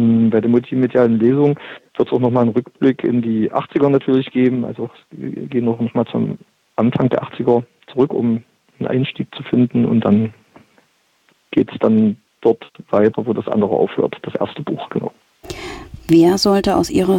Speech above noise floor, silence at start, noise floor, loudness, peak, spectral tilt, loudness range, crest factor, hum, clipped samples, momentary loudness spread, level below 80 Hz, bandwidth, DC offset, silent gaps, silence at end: 43 dB; 0 s; -59 dBFS; -17 LUFS; -2 dBFS; -7 dB/octave; 3 LU; 14 dB; none; under 0.1%; 13 LU; -50 dBFS; 16 kHz; under 0.1%; none; 0 s